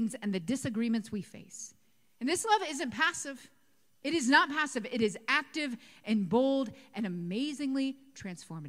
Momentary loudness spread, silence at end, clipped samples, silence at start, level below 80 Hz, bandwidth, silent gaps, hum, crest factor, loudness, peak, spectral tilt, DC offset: 16 LU; 0 s; under 0.1%; 0 s; -72 dBFS; 15.5 kHz; none; none; 24 dB; -31 LUFS; -10 dBFS; -4 dB/octave; under 0.1%